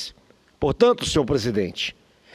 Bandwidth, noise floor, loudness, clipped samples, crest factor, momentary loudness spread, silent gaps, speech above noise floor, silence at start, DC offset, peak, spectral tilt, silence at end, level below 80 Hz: 14 kHz; -55 dBFS; -22 LUFS; under 0.1%; 18 dB; 10 LU; none; 34 dB; 0 s; under 0.1%; -4 dBFS; -5 dB/octave; 0.45 s; -44 dBFS